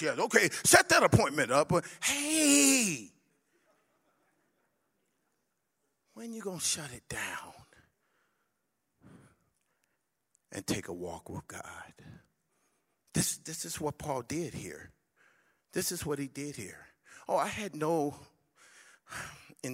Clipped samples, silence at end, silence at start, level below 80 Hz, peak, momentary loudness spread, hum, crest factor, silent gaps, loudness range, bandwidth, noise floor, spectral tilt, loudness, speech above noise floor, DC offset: under 0.1%; 0 s; 0 s; -62 dBFS; -6 dBFS; 22 LU; none; 28 dB; none; 17 LU; 16 kHz; -82 dBFS; -3 dB/octave; -29 LUFS; 51 dB; under 0.1%